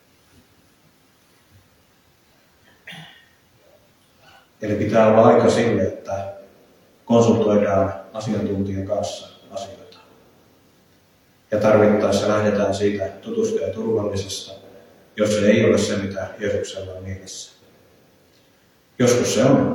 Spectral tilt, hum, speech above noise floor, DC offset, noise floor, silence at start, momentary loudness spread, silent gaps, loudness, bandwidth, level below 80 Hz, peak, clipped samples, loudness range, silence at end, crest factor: -5.5 dB/octave; none; 39 dB; under 0.1%; -57 dBFS; 2.85 s; 19 LU; none; -19 LUFS; 18 kHz; -60 dBFS; 0 dBFS; under 0.1%; 9 LU; 0 s; 20 dB